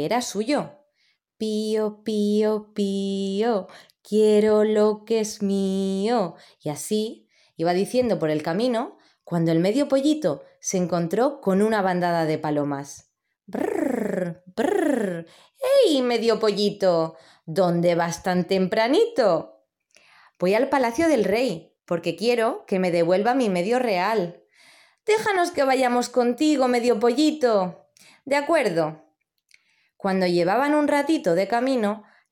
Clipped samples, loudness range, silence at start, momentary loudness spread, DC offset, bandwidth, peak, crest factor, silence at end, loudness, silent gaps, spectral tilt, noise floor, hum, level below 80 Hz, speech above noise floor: under 0.1%; 4 LU; 0 s; 9 LU; under 0.1%; 17 kHz; -8 dBFS; 14 dB; 0.3 s; -23 LUFS; none; -5.5 dB/octave; -69 dBFS; none; -68 dBFS; 47 dB